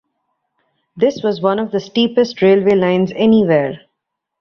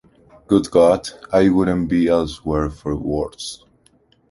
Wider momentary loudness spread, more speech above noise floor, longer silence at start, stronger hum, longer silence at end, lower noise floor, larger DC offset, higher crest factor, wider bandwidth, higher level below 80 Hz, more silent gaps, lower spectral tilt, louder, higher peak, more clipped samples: second, 7 LU vs 12 LU; first, 63 dB vs 40 dB; first, 0.95 s vs 0.5 s; neither; about the same, 0.65 s vs 0.75 s; first, -77 dBFS vs -57 dBFS; neither; about the same, 14 dB vs 16 dB; second, 6.8 kHz vs 11.5 kHz; second, -56 dBFS vs -38 dBFS; neither; about the same, -7 dB/octave vs -6.5 dB/octave; first, -15 LUFS vs -18 LUFS; about the same, -2 dBFS vs -2 dBFS; neither